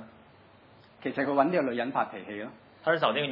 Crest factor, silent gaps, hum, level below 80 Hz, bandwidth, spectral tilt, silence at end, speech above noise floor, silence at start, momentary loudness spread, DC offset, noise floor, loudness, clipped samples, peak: 20 dB; none; none; -78 dBFS; 5.6 kHz; -8.5 dB/octave; 0 s; 28 dB; 0 s; 14 LU; under 0.1%; -56 dBFS; -29 LUFS; under 0.1%; -10 dBFS